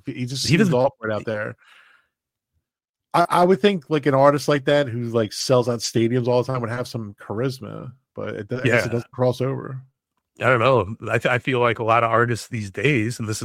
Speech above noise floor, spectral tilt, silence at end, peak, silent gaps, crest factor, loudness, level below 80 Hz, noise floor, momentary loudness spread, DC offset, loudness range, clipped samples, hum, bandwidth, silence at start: 66 dB; -5.5 dB/octave; 0 s; -2 dBFS; 2.89-2.93 s; 20 dB; -21 LUFS; -58 dBFS; -87 dBFS; 14 LU; under 0.1%; 6 LU; under 0.1%; none; 16 kHz; 0.05 s